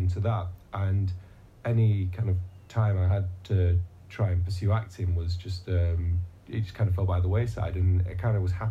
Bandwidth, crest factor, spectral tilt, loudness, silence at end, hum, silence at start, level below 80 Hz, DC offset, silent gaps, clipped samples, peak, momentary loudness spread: 7.6 kHz; 12 dB; -8.5 dB/octave; -28 LUFS; 0 s; none; 0 s; -46 dBFS; under 0.1%; none; under 0.1%; -14 dBFS; 8 LU